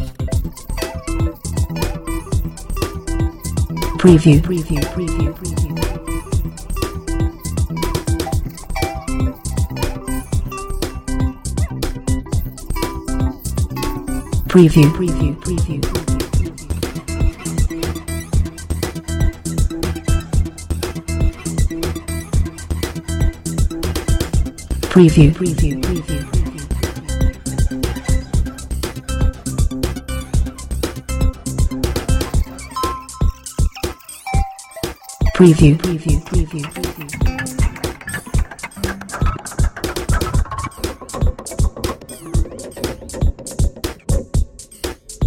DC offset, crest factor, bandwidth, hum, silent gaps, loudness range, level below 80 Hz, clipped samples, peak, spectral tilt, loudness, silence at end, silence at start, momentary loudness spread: under 0.1%; 18 dB; 17 kHz; none; none; 7 LU; -22 dBFS; under 0.1%; 0 dBFS; -6 dB/octave; -19 LUFS; 0 s; 0 s; 11 LU